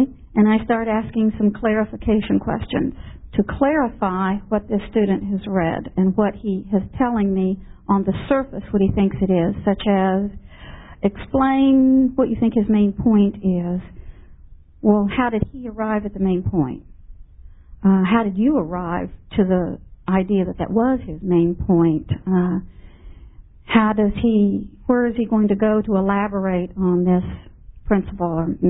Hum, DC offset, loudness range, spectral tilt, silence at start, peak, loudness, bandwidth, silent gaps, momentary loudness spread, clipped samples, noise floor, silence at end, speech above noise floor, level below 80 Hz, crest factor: none; under 0.1%; 3 LU; -12.5 dB/octave; 0 s; -2 dBFS; -20 LUFS; 4 kHz; none; 8 LU; under 0.1%; -44 dBFS; 0 s; 25 dB; -38 dBFS; 18 dB